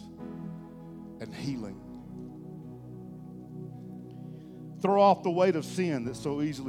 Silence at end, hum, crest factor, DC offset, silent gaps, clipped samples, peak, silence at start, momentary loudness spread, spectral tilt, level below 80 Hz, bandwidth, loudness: 0 s; none; 22 dB; under 0.1%; none; under 0.1%; -10 dBFS; 0 s; 21 LU; -6.5 dB/octave; -62 dBFS; 14 kHz; -28 LUFS